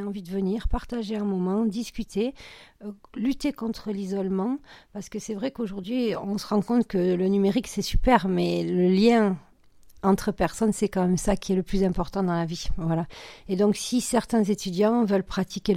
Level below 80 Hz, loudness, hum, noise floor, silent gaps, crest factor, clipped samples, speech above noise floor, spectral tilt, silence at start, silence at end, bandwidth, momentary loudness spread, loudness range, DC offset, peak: -38 dBFS; -26 LUFS; none; -51 dBFS; none; 18 dB; under 0.1%; 27 dB; -6 dB/octave; 0 s; 0 s; 15.5 kHz; 11 LU; 7 LU; under 0.1%; -6 dBFS